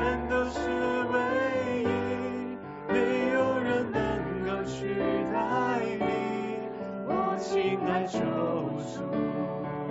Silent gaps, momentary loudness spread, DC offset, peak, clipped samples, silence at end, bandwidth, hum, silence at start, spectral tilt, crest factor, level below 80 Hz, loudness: none; 7 LU; under 0.1%; -12 dBFS; under 0.1%; 0 s; 8 kHz; none; 0 s; -5 dB/octave; 16 dB; -52 dBFS; -29 LUFS